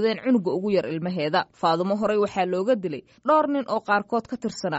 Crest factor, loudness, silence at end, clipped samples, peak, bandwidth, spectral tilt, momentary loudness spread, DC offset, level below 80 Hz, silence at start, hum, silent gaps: 16 dB; -24 LUFS; 0 s; under 0.1%; -8 dBFS; 8 kHz; -4.5 dB/octave; 7 LU; under 0.1%; -64 dBFS; 0 s; none; none